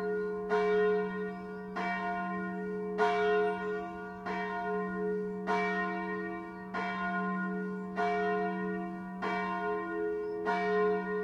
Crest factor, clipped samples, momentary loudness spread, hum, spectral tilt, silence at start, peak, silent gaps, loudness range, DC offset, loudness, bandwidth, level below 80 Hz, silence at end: 18 dB; under 0.1%; 9 LU; none; -7 dB/octave; 0 s; -16 dBFS; none; 2 LU; under 0.1%; -33 LUFS; 7.4 kHz; -66 dBFS; 0 s